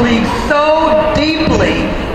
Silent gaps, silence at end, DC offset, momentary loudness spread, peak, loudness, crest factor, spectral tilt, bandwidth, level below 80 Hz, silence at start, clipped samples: none; 0 s; 0.4%; 3 LU; 0 dBFS; -12 LUFS; 12 dB; -5.5 dB/octave; 13 kHz; -26 dBFS; 0 s; under 0.1%